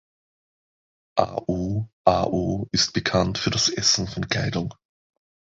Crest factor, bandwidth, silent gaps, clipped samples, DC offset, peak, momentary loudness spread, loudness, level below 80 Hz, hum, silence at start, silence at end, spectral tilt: 22 dB; 8 kHz; 1.93-2.04 s; under 0.1%; under 0.1%; -2 dBFS; 7 LU; -23 LUFS; -46 dBFS; none; 1.15 s; 0.85 s; -3.5 dB/octave